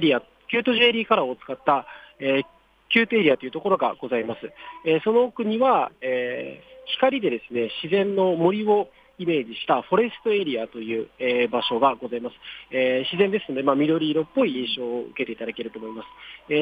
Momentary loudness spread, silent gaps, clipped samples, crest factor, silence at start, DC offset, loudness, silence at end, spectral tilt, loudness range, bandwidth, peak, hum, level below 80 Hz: 13 LU; none; under 0.1%; 18 dB; 0 s; under 0.1%; -23 LUFS; 0 s; -7.5 dB/octave; 2 LU; 5 kHz; -6 dBFS; none; -66 dBFS